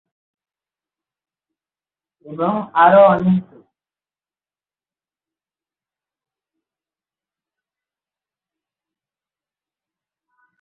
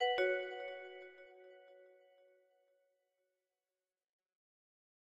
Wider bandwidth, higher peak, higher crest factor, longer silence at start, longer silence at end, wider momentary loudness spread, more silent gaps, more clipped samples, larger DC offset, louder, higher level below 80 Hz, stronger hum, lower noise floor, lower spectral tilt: second, 4.1 kHz vs 11.5 kHz; first, -2 dBFS vs -24 dBFS; about the same, 22 dB vs 22 dB; first, 2.25 s vs 0 s; first, 7.2 s vs 3.3 s; second, 13 LU vs 25 LU; neither; neither; neither; first, -14 LUFS vs -39 LUFS; first, -62 dBFS vs -88 dBFS; neither; about the same, under -90 dBFS vs under -90 dBFS; first, -10.5 dB/octave vs -2.5 dB/octave